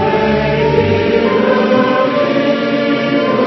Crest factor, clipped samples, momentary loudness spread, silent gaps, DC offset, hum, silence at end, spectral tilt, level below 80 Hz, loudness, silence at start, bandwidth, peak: 12 dB; under 0.1%; 2 LU; none; under 0.1%; none; 0 s; -7.5 dB/octave; -38 dBFS; -13 LUFS; 0 s; 6.2 kHz; 0 dBFS